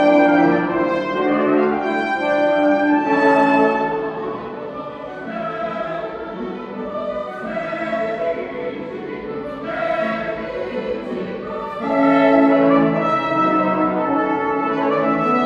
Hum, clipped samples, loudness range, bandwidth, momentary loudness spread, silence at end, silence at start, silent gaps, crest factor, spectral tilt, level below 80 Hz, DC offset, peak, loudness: none; under 0.1%; 9 LU; 7.6 kHz; 14 LU; 0 s; 0 s; none; 16 dB; -7.5 dB/octave; -54 dBFS; under 0.1%; -2 dBFS; -19 LUFS